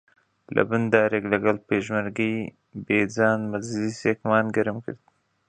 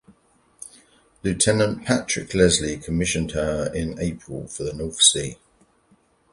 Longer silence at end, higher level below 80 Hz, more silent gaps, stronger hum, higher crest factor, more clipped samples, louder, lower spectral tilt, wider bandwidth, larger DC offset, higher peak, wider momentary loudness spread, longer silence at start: second, 0.55 s vs 1 s; second, -60 dBFS vs -42 dBFS; neither; neither; about the same, 22 dB vs 24 dB; neither; second, -24 LUFS vs -21 LUFS; first, -6.5 dB/octave vs -3.5 dB/octave; second, 9.4 kHz vs 11.5 kHz; neither; about the same, -2 dBFS vs 0 dBFS; second, 12 LU vs 18 LU; about the same, 0.5 s vs 0.6 s